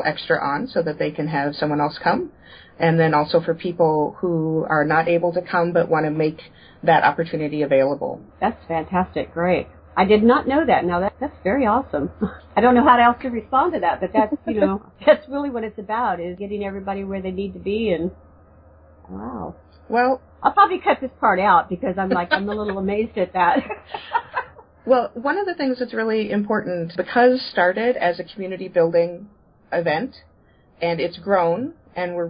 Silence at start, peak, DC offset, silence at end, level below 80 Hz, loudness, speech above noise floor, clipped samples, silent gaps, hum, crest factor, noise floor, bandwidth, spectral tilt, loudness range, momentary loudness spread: 0 s; -2 dBFS; under 0.1%; 0 s; -48 dBFS; -20 LUFS; 34 dB; under 0.1%; none; none; 18 dB; -54 dBFS; 5.2 kHz; -11 dB/octave; 6 LU; 11 LU